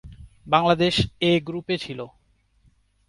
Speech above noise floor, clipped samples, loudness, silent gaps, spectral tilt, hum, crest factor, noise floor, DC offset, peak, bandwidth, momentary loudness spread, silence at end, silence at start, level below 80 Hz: 39 dB; under 0.1%; -22 LUFS; none; -5.5 dB/octave; none; 22 dB; -61 dBFS; under 0.1%; -4 dBFS; 11.5 kHz; 15 LU; 1 s; 0.05 s; -48 dBFS